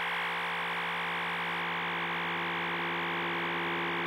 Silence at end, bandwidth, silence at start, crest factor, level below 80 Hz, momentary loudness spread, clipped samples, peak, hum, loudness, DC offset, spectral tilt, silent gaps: 0 s; 16.5 kHz; 0 s; 12 dB; -80 dBFS; 1 LU; under 0.1%; -22 dBFS; none; -32 LUFS; under 0.1%; -4.5 dB/octave; none